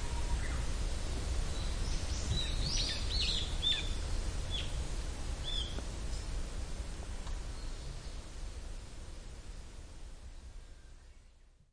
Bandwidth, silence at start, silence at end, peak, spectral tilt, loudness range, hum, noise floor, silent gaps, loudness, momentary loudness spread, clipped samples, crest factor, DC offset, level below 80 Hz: 10.5 kHz; 0 s; 0.25 s; -20 dBFS; -3.5 dB/octave; 15 LU; none; -60 dBFS; none; -38 LUFS; 19 LU; under 0.1%; 16 dB; under 0.1%; -38 dBFS